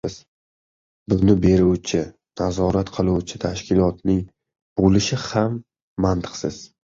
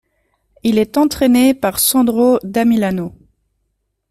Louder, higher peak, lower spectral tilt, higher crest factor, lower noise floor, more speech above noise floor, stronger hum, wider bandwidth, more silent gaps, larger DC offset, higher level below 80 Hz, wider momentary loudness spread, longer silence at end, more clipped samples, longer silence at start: second, -21 LUFS vs -14 LUFS; about the same, -2 dBFS vs -2 dBFS; first, -6.5 dB/octave vs -4.5 dB/octave; about the same, 18 dB vs 14 dB; first, under -90 dBFS vs -69 dBFS; first, over 70 dB vs 56 dB; neither; second, 7.6 kHz vs 16 kHz; first, 0.28-1.06 s, 4.62-4.76 s, 5.82-5.96 s vs none; neither; first, -38 dBFS vs -48 dBFS; first, 14 LU vs 8 LU; second, 0.3 s vs 1 s; neither; second, 0.05 s vs 0.65 s